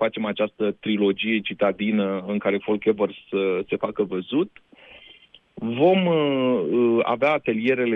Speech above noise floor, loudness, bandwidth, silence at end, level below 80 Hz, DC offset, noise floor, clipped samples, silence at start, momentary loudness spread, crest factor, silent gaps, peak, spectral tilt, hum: 30 dB; -23 LUFS; 5.2 kHz; 0 s; -66 dBFS; under 0.1%; -52 dBFS; under 0.1%; 0 s; 6 LU; 16 dB; none; -8 dBFS; -8.5 dB/octave; none